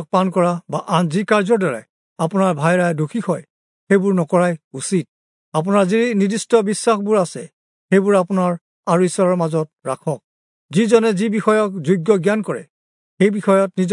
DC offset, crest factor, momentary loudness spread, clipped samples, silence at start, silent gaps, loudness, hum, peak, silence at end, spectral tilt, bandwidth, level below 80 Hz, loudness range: under 0.1%; 16 dB; 10 LU; under 0.1%; 0 s; 1.89-2.16 s, 3.50-3.87 s, 4.64-4.71 s, 5.09-5.52 s, 7.53-7.88 s, 8.61-8.83 s, 10.24-10.69 s, 12.70-13.17 s; -18 LUFS; none; -2 dBFS; 0 s; -6 dB/octave; 11 kHz; -70 dBFS; 2 LU